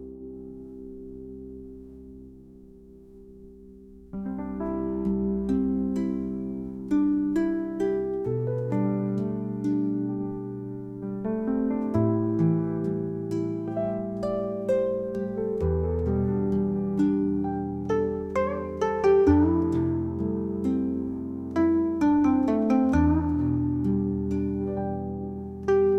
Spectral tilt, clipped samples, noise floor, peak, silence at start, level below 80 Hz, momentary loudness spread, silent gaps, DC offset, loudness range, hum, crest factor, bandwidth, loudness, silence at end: -9.5 dB/octave; under 0.1%; -49 dBFS; -10 dBFS; 0 s; -46 dBFS; 14 LU; none; under 0.1%; 9 LU; none; 18 dB; 8.4 kHz; -26 LUFS; 0 s